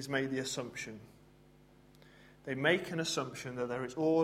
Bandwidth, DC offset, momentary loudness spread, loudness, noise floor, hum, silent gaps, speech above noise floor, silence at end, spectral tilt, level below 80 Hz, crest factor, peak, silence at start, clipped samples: 16 kHz; under 0.1%; 14 LU; -35 LUFS; -62 dBFS; none; none; 27 dB; 0 s; -4 dB/octave; -70 dBFS; 22 dB; -14 dBFS; 0 s; under 0.1%